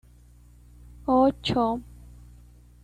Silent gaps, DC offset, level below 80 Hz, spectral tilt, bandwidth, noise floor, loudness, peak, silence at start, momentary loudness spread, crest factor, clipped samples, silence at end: none; under 0.1%; -48 dBFS; -6.5 dB/octave; 10 kHz; -53 dBFS; -25 LUFS; -10 dBFS; 1 s; 13 LU; 18 dB; under 0.1%; 1 s